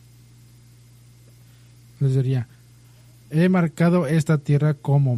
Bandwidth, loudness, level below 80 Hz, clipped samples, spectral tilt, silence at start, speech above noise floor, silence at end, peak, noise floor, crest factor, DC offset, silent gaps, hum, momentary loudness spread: 12.5 kHz; -21 LUFS; -58 dBFS; under 0.1%; -8.5 dB/octave; 2 s; 31 dB; 0 s; -8 dBFS; -50 dBFS; 14 dB; under 0.1%; none; none; 7 LU